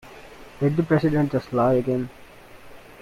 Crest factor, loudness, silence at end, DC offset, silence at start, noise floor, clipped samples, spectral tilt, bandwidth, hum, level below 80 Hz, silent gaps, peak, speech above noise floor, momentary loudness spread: 16 dB; -22 LUFS; 0.2 s; under 0.1%; 0.05 s; -45 dBFS; under 0.1%; -9 dB/octave; 15 kHz; none; -50 dBFS; none; -8 dBFS; 24 dB; 16 LU